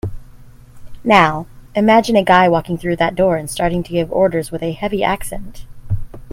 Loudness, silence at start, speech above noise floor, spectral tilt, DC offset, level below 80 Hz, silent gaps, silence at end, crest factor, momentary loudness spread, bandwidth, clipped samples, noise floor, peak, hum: -16 LUFS; 0.05 s; 24 dB; -5.5 dB/octave; under 0.1%; -36 dBFS; none; 0 s; 16 dB; 14 LU; 16.5 kHz; under 0.1%; -39 dBFS; 0 dBFS; none